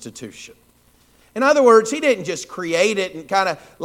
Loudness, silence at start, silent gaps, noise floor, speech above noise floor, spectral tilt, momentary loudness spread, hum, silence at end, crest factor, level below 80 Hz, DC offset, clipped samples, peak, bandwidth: -18 LUFS; 0 s; none; -56 dBFS; 37 dB; -3.5 dB/octave; 21 LU; 60 Hz at -50 dBFS; 0 s; 18 dB; -62 dBFS; under 0.1%; under 0.1%; 0 dBFS; 15.5 kHz